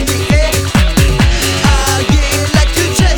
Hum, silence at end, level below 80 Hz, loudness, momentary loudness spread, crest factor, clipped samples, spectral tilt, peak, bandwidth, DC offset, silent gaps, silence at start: none; 0 s; -14 dBFS; -11 LUFS; 1 LU; 10 dB; under 0.1%; -4 dB/octave; 0 dBFS; over 20 kHz; under 0.1%; none; 0 s